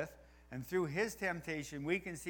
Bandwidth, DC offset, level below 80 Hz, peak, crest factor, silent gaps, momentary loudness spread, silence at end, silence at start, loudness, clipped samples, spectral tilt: over 20 kHz; under 0.1%; -64 dBFS; -22 dBFS; 18 dB; none; 11 LU; 0 s; 0 s; -39 LUFS; under 0.1%; -5 dB/octave